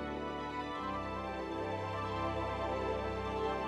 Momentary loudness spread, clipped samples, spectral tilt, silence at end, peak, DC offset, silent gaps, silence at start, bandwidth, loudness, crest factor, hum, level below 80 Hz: 3 LU; under 0.1%; -6.5 dB/octave; 0 s; -24 dBFS; under 0.1%; none; 0 s; 12.5 kHz; -38 LUFS; 14 dB; none; -52 dBFS